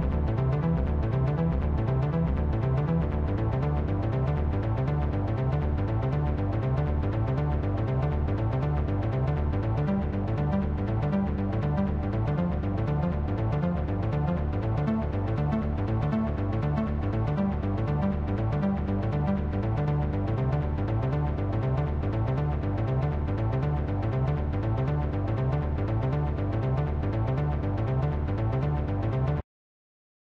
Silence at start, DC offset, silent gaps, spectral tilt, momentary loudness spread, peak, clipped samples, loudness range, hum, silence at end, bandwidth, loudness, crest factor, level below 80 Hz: 0 s; under 0.1%; none; -10.5 dB/octave; 2 LU; -14 dBFS; under 0.1%; 1 LU; none; 0.95 s; 5.6 kHz; -28 LUFS; 12 dB; -34 dBFS